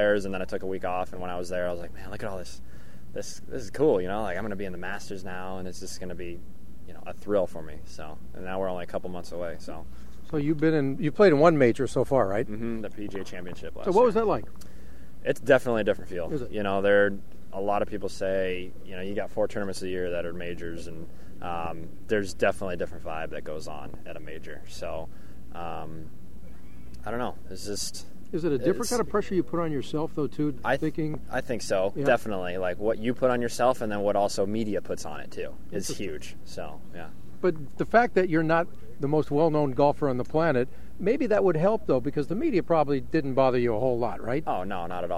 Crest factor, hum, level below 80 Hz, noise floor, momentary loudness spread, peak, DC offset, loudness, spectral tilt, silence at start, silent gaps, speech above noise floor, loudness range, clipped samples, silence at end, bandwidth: 22 dB; none; -50 dBFS; -47 dBFS; 18 LU; -6 dBFS; 3%; -28 LUFS; -6 dB/octave; 0 s; none; 20 dB; 10 LU; under 0.1%; 0 s; 16 kHz